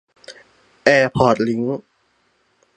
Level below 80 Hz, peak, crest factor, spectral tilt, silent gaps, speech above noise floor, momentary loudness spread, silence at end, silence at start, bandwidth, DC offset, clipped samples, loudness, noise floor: -50 dBFS; 0 dBFS; 20 dB; -6 dB/octave; none; 47 dB; 10 LU; 0.95 s; 0.3 s; 9.8 kHz; under 0.1%; under 0.1%; -17 LUFS; -63 dBFS